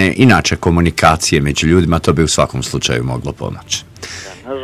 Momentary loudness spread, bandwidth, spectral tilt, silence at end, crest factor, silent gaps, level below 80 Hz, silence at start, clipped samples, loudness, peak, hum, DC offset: 16 LU; 15.5 kHz; -4.5 dB/octave; 0 s; 14 dB; none; -28 dBFS; 0 s; 0.2%; -13 LUFS; 0 dBFS; none; under 0.1%